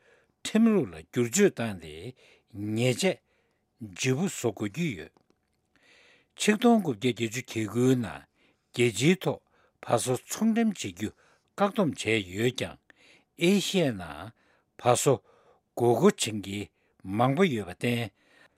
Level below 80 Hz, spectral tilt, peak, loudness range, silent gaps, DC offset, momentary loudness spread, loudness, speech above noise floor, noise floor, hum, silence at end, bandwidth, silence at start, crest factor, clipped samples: -66 dBFS; -5 dB/octave; -6 dBFS; 4 LU; none; under 0.1%; 18 LU; -27 LUFS; 45 dB; -72 dBFS; none; 0.5 s; 16 kHz; 0.45 s; 24 dB; under 0.1%